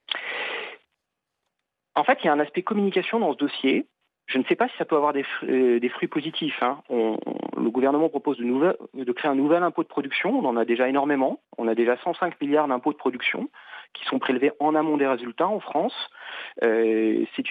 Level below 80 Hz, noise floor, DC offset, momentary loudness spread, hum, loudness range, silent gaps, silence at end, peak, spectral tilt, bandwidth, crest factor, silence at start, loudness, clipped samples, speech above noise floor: -82 dBFS; -82 dBFS; under 0.1%; 9 LU; none; 2 LU; none; 0 s; -8 dBFS; -7.5 dB/octave; 4.9 kHz; 16 dB; 0.1 s; -24 LUFS; under 0.1%; 58 dB